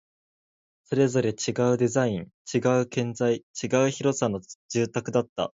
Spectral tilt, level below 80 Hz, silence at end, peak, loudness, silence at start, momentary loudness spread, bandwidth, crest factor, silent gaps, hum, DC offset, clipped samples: -5.5 dB/octave; -62 dBFS; 0.1 s; -8 dBFS; -26 LUFS; 0.9 s; 7 LU; 7.8 kHz; 18 dB; 2.34-2.45 s, 3.43-3.54 s, 4.55-4.69 s, 5.29-5.36 s; none; under 0.1%; under 0.1%